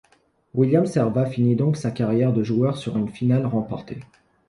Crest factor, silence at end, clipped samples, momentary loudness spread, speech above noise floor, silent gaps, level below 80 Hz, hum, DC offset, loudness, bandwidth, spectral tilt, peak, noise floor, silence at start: 16 dB; 0.45 s; under 0.1%; 11 LU; 41 dB; none; -56 dBFS; none; under 0.1%; -22 LUFS; 11.5 kHz; -8.5 dB/octave; -6 dBFS; -61 dBFS; 0.55 s